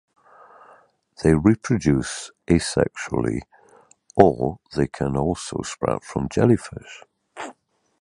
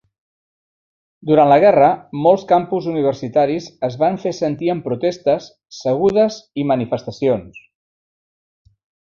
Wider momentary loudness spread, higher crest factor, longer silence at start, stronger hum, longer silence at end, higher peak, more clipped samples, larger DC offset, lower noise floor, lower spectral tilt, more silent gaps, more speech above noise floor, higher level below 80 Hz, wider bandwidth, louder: first, 19 LU vs 11 LU; first, 22 dB vs 16 dB; about the same, 1.2 s vs 1.25 s; neither; second, 0.5 s vs 1.6 s; about the same, 0 dBFS vs -2 dBFS; neither; neither; second, -56 dBFS vs under -90 dBFS; about the same, -6.5 dB/octave vs -7 dB/octave; neither; second, 35 dB vs over 74 dB; first, -42 dBFS vs -56 dBFS; first, 11.5 kHz vs 7.2 kHz; second, -22 LUFS vs -17 LUFS